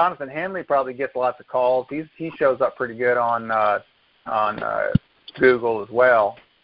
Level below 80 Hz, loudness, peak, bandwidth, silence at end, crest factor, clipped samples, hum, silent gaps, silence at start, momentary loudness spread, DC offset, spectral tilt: -50 dBFS; -21 LUFS; -2 dBFS; 5.2 kHz; 0.3 s; 20 dB; under 0.1%; none; none; 0 s; 10 LU; under 0.1%; -11 dB/octave